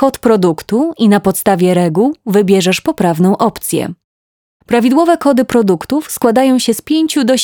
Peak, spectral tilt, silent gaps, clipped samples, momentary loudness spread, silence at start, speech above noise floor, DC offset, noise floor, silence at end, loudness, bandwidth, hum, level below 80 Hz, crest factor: 0 dBFS; -5.5 dB/octave; 4.04-4.60 s; under 0.1%; 5 LU; 0 s; over 79 dB; under 0.1%; under -90 dBFS; 0 s; -12 LUFS; over 20 kHz; none; -48 dBFS; 12 dB